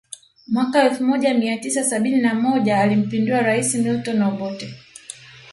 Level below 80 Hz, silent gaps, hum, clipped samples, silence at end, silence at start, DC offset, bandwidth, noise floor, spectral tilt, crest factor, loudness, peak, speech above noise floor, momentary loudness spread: -64 dBFS; none; none; under 0.1%; 0 s; 0.1 s; under 0.1%; 11.5 kHz; -41 dBFS; -4.5 dB/octave; 16 dB; -19 LUFS; -4 dBFS; 22 dB; 19 LU